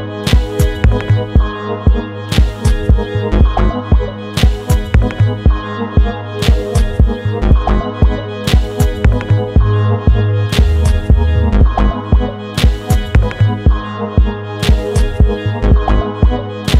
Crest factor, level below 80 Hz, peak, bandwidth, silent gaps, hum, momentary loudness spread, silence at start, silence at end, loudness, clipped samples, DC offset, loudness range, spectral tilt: 12 dB; -14 dBFS; 0 dBFS; 14 kHz; none; none; 4 LU; 0 s; 0 s; -14 LUFS; under 0.1%; 0.2%; 2 LU; -6.5 dB/octave